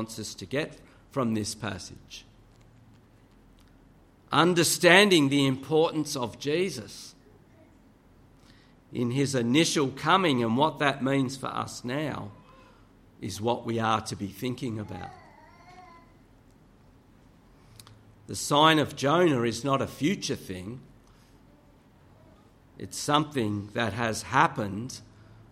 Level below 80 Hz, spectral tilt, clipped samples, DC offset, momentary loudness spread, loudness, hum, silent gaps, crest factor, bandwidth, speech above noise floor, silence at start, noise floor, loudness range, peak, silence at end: -62 dBFS; -4.5 dB/octave; under 0.1%; under 0.1%; 19 LU; -26 LUFS; none; none; 26 dB; 16 kHz; 31 dB; 0 s; -57 dBFS; 13 LU; -4 dBFS; 0.5 s